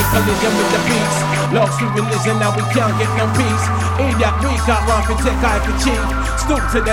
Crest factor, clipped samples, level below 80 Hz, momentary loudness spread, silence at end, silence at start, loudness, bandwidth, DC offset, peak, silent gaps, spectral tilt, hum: 14 dB; under 0.1%; -24 dBFS; 2 LU; 0 s; 0 s; -16 LUFS; 17.5 kHz; 0.4%; -2 dBFS; none; -5 dB/octave; none